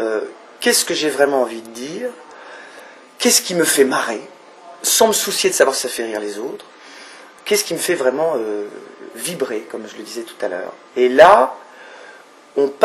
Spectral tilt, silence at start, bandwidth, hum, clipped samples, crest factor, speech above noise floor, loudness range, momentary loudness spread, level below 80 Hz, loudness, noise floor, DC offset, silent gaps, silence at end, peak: -1.5 dB/octave; 0 s; 14.5 kHz; none; under 0.1%; 18 dB; 26 dB; 6 LU; 23 LU; -62 dBFS; -17 LUFS; -43 dBFS; under 0.1%; none; 0 s; 0 dBFS